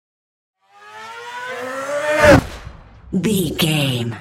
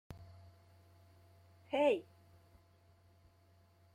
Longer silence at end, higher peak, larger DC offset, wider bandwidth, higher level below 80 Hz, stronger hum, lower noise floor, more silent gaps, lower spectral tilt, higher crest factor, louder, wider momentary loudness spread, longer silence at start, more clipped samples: second, 0 s vs 1.9 s; first, 0 dBFS vs -20 dBFS; neither; first, 16.5 kHz vs 12 kHz; first, -38 dBFS vs -74 dBFS; neither; second, -40 dBFS vs -68 dBFS; neither; about the same, -5 dB/octave vs -6 dB/octave; about the same, 18 dB vs 22 dB; first, -17 LUFS vs -35 LUFS; second, 22 LU vs 28 LU; first, 0.8 s vs 0.1 s; neither